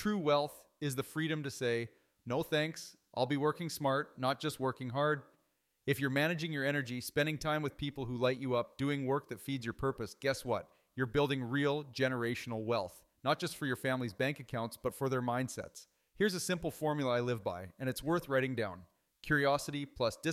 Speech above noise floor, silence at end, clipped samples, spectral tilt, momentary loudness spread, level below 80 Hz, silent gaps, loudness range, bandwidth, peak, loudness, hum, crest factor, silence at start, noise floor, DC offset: 43 dB; 0 s; under 0.1%; -5 dB/octave; 8 LU; -64 dBFS; none; 2 LU; 16 kHz; -18 dBFS; -36 LUFS; none; 18 dB; 0 s; -78 dBFS; under 0.1%